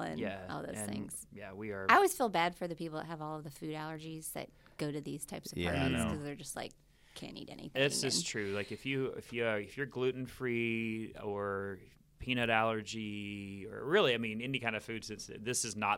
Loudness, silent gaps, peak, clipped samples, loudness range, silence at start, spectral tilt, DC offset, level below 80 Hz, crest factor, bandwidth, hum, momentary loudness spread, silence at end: -36 LUFS; none; -10 dBFS; under 0.1%; 5 LU; 0 s; -4 dB/octave; under 0.1%; -62 dBFS; 26 dB; 16.5 kHz; none; 14 LU; 0 s